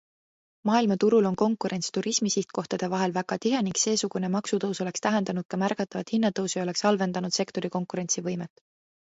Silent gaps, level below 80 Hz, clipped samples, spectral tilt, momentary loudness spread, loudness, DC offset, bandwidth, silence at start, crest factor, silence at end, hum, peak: 5.45-5.49 s; -70 dBFS; under 0.1%; -4.5 dB/octave; 8 LU; -27 LUFS; under 0.1%; 8 kHz; 0.65 s; 18 dB; 0.7 s; none; -10 dBFS